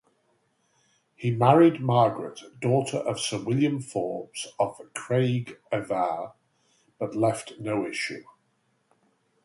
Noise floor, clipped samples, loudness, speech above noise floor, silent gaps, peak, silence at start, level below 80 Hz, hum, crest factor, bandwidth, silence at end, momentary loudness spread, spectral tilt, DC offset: -71 dBFS; under 0.1%; -26 LUFS; 45 dB; none; -4 dBFS; 1.2 s; -68 dBFS; none; 24 dB; 11.5 kHz; 1.2 s; 15 LU; -6 dB/octave; under 0.1%